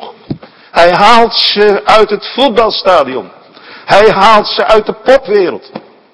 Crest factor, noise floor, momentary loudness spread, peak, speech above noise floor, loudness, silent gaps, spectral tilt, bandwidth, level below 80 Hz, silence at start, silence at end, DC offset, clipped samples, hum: 10 dB; -34 dBFS; 19 LU; 0 dBFS; 27 dB; -8 LUFS; none; -4 dB/octave; 11 kHz; -38 dBFS; 0 s; 0.25 s; under 0.1%; 4%; none